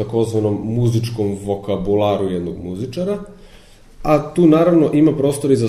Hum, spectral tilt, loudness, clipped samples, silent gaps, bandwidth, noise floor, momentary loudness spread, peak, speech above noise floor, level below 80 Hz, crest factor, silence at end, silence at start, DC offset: none; -7.5 dB/octave; -17 LUFS; under 0.1%; none; 13.5 kHz; -43 dBFS; 12 LU; -2 dBFS; 27 dB; -42 dBFS; 16 dB; 0 s; 0 s; under 0.1%